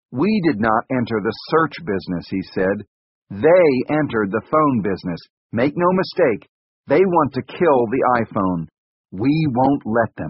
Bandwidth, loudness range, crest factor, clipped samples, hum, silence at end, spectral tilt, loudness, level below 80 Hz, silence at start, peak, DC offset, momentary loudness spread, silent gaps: 5.8 kHz; 2 LU; 16 dB; under 0.1%; none; 0 s; -6 dB/octave; -19 LUFS; -52 dBFS; 0.1 s; -2 dBFS; under 0.1%; 11 LU; 2.87-3.22 s, 5.30-5.50 s, 6.49-6.83 s, 8.78-9.04 s